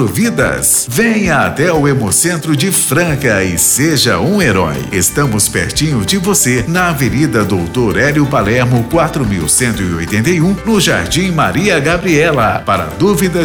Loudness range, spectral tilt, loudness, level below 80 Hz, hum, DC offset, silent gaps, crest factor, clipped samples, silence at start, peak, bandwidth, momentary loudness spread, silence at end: 1 LU; -4 dB/octave; -11 LUFS; -32 dBFS; none; under 0.1%; none; 10 dB; under 0.1%; 0 s; -2 dBFS; over 20 kHz; 4 LU; 0 s